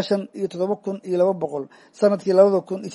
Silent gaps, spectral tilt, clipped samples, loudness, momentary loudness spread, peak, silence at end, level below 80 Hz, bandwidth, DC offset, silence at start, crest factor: none; -7 dB/octave; under 0.1%; -21 LUFS; 12 LU; -2 dBFS; 0 s; -74 dBFS; 11.5 kHz; under 0.1%; 0 s; 18 dB